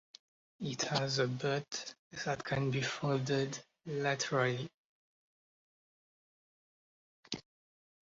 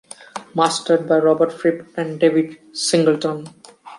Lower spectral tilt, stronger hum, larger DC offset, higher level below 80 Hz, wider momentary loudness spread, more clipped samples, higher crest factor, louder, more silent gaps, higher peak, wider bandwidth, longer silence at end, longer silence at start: about the same, -4 dB/octave vs -4.5 dB/octave; neither; neither; about the same, -72 dBFS vs -70 dBFS; about the same, 12 LU vs 11 LU; neither; about the same, 20 dB vs 16 dB; second, -36 LUFS vs -18 LUFS; first, 1.99-2.11 s, 4.74-7.23 s vs none; second, -18 dBFS vs -2 dBFS; second, 7.6 kHz vs 11.5 kHz; first, 0.6 s vs 0 s; first, 0.6 s vs 0.35 s